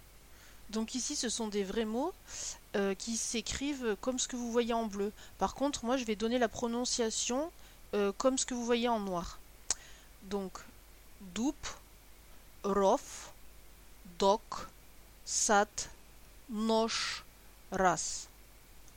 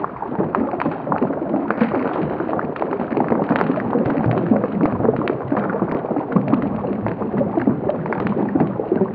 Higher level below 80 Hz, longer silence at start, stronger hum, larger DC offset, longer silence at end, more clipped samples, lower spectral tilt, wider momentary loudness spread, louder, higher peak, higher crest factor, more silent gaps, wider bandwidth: second, -56 dBFS vs -50 dBFS; about the same, 0 s vs 0 s; neither; neither; about the same, 0 s vs 0 s; neither; second, -3 dB/octave vs -11.5 dB/octave; first, 14 LU vs 5 LU; second, -34 LUFS vs -21 LUFS; second, -14 dBFS vs 0 dBFS; about the same, 22 dB vs 20 dB; neither; first, 17 kHz vs 5 kHz